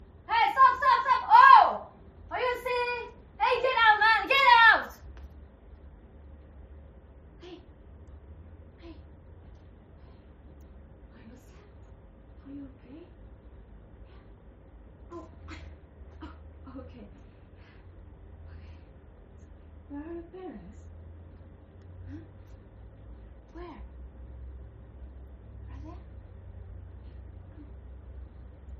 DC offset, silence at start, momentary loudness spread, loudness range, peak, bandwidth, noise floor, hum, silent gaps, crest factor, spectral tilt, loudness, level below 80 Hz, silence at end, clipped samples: under 0.1%; 0.3 s; 30 LU; 28 LU; -4 dBFS; 10 kHz; -52 dBFS; none; none; 26 dB; -4.5 dB/octave; -21 LUFS; -50 dBFS; 0.05 s; under 0.1%